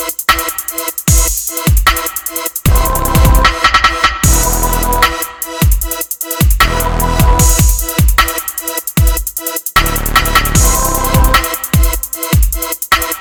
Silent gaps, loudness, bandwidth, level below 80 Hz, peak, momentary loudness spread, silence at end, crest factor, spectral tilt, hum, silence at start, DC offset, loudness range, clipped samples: none; -12 LUFS; 20 kHz; -16 dBFS; 0 dBFS; 8 LU; 0 s; 12 dB; -3 dB/octave; none; 0 s; under 0.1%; 1 LU; under 0.1%